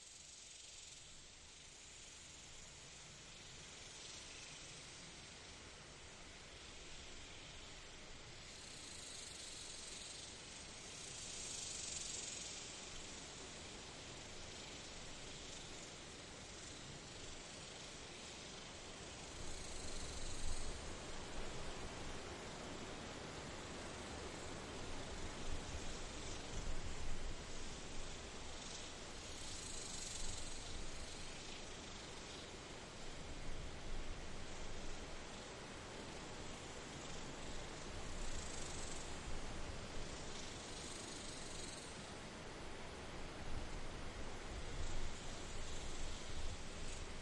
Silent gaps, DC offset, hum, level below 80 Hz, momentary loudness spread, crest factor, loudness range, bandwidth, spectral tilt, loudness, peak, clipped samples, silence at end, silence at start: none; under 0.1%; none; -52 dBFS; 7 LU; 18 dB; 6 LU; 11.5 kHz; -2.5 dB/octave; -50 LUFS; -30 dBFS; under 0.1%; 0 s; 0 s